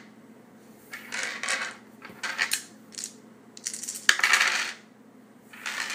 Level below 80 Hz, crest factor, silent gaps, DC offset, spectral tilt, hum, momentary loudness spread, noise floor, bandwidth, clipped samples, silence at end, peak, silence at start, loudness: -84 dBFS; 32 dB; none; under 0.1%; 1 dB/octave; none; 24 LU; -53 dBFS; 16 kHz; under 0.1%; 0 s; 0 dBFS; 0 s; -27 LUFS